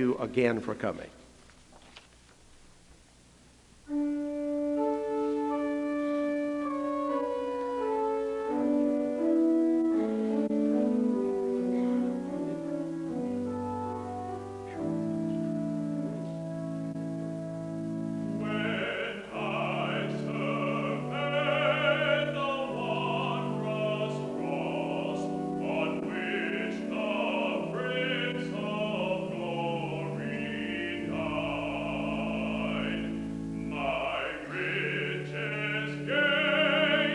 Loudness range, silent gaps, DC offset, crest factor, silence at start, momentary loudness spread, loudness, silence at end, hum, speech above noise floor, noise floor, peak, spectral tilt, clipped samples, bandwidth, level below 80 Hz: 6 LU; none; under 0.1%; 18 dB; 0 s; 9 LU; -31 LUFS; 0 s; none; 28 dB; -58 dBFS; -12 dBFS; -6.5 dB/octave; under 0.1%; 11.5 kHz; -60 dBFS